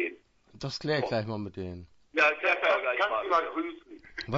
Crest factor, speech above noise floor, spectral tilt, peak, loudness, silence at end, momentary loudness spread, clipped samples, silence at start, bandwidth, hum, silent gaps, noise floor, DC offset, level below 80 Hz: 18 dB; 25 dB; -5.5 dB/octave; -12 dBFS; -28 LUFS; 0 s; 16 LU; under 0.1%; 0 s; 7.8 kHz; none; none; -53 dBFS; under 0.1%; -62 dBFS